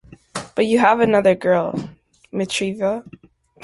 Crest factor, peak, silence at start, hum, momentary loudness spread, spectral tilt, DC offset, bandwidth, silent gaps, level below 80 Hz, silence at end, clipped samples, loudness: 18 dB; -2 dBFS; 0.35 s; none; 16 LU; -5 dB/octave; under 0.1%; 11.5 kHz; none; -56 dBFS; 0.55 s; under 0.1%; -19 LUFS